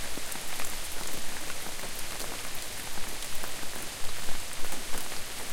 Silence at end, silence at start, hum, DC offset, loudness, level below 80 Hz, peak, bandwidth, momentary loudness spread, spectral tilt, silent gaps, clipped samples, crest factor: 0 s; 0 s; none; under 0.1%; -36 LUFS; -42 dBFS; -14 dBFS; 17 kHz; 1 LU; -1.5 dB/octave; none; under 0.1%; 14 dB